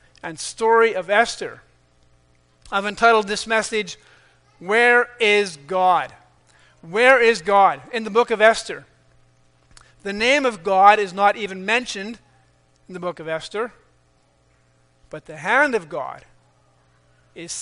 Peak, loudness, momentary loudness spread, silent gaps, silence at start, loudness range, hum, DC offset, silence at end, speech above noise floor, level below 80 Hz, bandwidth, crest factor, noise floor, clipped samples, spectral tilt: 0 dBFS; -18 LUFS; 19 LU; none; 0.25 s; 8 LU; none; under 0.1%; 0 s; 41 dB; -58 dBFS; 10.5 kHz; 20 dB; -60 dBFS; under 0.1%; -3 dB/octave